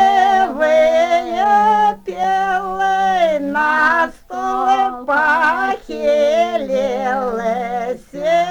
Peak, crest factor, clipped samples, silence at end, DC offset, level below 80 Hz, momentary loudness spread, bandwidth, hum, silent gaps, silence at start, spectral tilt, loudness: -2 dBFS; 12 dB; under 0.1%; 0 s; under 0.1%; -48 dBFS; 8 LU; 19.5 kHz; none; none; 0 s; -4 dB/octave; -16 LUFS